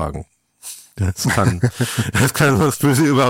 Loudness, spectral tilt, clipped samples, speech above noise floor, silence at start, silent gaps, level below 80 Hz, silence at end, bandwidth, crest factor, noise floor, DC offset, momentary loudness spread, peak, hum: -17 LUFS; -5 dB/octave; under 0.1%; 21 dB; 0 s; none; -40 dBFS; 0 s; 17 kHz; 14 dB; -38 dBFS; under 0.1%; 19 LU; -4 dBFS; none